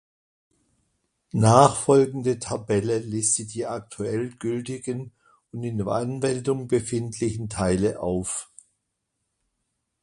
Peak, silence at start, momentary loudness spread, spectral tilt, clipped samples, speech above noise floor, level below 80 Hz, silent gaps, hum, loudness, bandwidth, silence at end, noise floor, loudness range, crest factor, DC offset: 0 dBFS; 1.35 s; 14 LU; -5.5 dB/octave; under 0.1%; 55 dB; -52 dBFS; none; none; -24 LUFS; 11.5 kHz; 1.6 s; -79 dBFS; 7 LU; 24 dB; under 0.1%